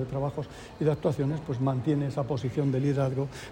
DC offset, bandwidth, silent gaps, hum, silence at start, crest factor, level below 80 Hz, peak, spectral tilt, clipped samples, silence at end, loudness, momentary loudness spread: under 0.1%; 10 kHz; none; none; 0 s; 16 dB; -54 dBFS; -12 dBFS; -8.5 dB/octave; under 0.1%; 0 s; -29 LUFS; 6 LU